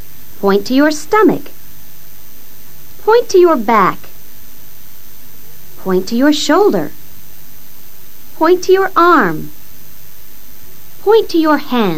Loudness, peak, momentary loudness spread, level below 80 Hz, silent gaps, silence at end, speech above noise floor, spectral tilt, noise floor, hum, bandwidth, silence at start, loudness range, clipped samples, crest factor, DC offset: -12 LUFS; 0 dBFS; 12 LU; -48 dBFS; none; 0 s; 28 dB; -5 dB/octave; -39 dBFS; none; 16.5 kHz; 0.45 s; 3 LU; under 0.1%; 16 dB; 9%